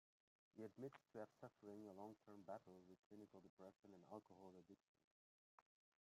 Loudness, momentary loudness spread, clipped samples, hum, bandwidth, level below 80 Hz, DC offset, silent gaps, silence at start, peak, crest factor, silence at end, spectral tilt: -62 LUFS; 9 LU; under 0.1%; none; 13 kHz; under -90 dBFS; under 0.1%; 2.99-3.10 s, 3.49-3.57 s, 3.79-3.83 s, 4.88-4.95 s, 5.04-5.58 s; 0.55 s; -42 dBFS; 20 dB; 0.45 s; -7 dB/octave